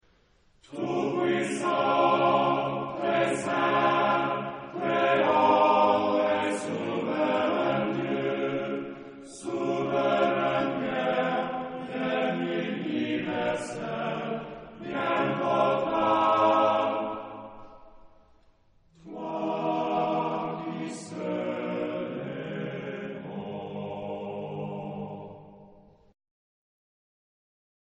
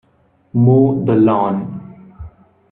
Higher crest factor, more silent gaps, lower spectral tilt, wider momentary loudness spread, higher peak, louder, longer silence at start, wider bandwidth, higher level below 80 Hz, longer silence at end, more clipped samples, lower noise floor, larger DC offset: about the same, 18 dB vs 16 dB; neither; second, -5.5 dB/octave vs -13 dB/octave; about the same, 14 LU vs 14 LU; second, -10 dBFS vs 0 dBFS; second, -27 LUFS vs -14 LUFS; first, 0.7 s vs 0.55 s; first, 10 kHz vs 3.9 kHz; second, -66 dBFS vs -48 dBFS; first, 2.25 s vs 0.45 s; neither; first, -63 dBFS vs -56 dBFS; neither